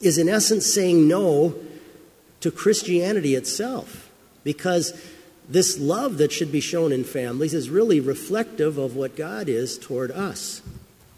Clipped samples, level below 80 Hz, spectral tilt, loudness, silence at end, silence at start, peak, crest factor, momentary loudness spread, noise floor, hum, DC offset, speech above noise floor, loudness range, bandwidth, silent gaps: under 0.1%; -60 dBFS; -4.5 dB/octave; -22 LUFS; 0.4 s; 0 s; -6 dBFS; 18 dB; 12 LU; -51 dBFS; none; under 0.1%; 29 dB; 4 LU; 16 kHz; none